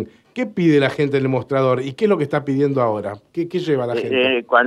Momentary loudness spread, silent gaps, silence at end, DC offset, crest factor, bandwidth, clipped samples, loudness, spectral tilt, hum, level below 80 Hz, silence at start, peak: 10 LU; none; 0 s; under 0.1%; 18 dB; 11 kHz; under 0.1%; -19 LUFS; -7 dB/octave; none; -62 dBFS; 0 s; 0 dBFS